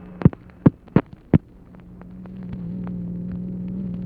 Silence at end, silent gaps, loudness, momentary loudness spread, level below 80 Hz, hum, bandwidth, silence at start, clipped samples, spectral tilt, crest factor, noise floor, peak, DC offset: 0 s; none; -24 LUFS; 19 LU; -40 dBFS; none; 4.5 kHz; 0 s; under 0.1%; -12 dB/octave; 24 dB; -45 dBFS; 0 dBFS; under 0.1%